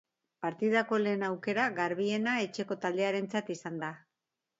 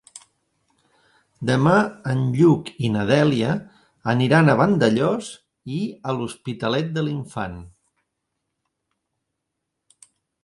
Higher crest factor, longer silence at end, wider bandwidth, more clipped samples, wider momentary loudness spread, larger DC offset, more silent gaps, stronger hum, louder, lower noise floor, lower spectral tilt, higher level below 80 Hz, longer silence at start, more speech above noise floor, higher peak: about the same, 20 dB vs 20 dB; second, 0.6 s vs 2.75 s; second, 8 kHz vs 11.5 kHz; neither; second, 10 LU vs 14 LU; neither; neither; neither; second, -32 LUFS vs -21 LUFS; first, -88 dBFS vs -80 dBFS; second, -5.5 dB/octave vs -7 dB/octave; second, -80 dBFS vs -56 dBFS; second, 0.4 s vs 1.4 s; second, 56 dB vs 60 dB; second, -14 dBFS vs -2 dBFS